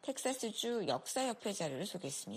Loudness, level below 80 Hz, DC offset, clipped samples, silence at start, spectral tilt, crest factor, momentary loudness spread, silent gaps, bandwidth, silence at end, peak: -38 LUFS; -82 dBFS; under 0.1%; under 0.1%; 0.05 s; -3 dB/octave; 16 dB; 5 LU; none; 15.5 kHz; 0 s; -22 dBFS